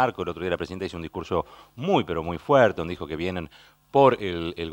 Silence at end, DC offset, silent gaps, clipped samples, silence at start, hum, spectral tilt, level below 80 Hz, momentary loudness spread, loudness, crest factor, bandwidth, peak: 0 s; under 0.1%; none; under 0.1%; 0 s; none; -7 dB/octave; -50 dBFS; 13 LU; -25 LUFS; 22 dB; 16.5 kHz; -4 dBFS